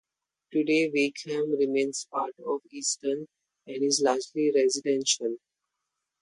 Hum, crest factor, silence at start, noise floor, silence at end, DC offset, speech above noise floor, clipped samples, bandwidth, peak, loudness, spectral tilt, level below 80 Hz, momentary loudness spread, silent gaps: none; 18 dB; 0.5 s; -84 dBFS; 0.85 s; under 0.1%; 57 dB; under 0.1%; 11.5 kHz; -10 dBFS; -27 LUFS; -2.5 dB/octave; -78 dBFS; 10 LU; none